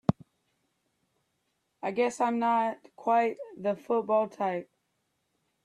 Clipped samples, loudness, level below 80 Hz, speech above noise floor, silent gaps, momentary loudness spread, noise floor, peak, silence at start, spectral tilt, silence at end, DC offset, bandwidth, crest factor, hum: under 0.1%; -29 LUFS; -70 dBFS; 49 dB; none; 9 LU; -78 dBFS; -8 dBFS; 0.1 s; -6.5 dB/octave; 1 s; under 0.1%; 11.5 kHz; 22 dB; none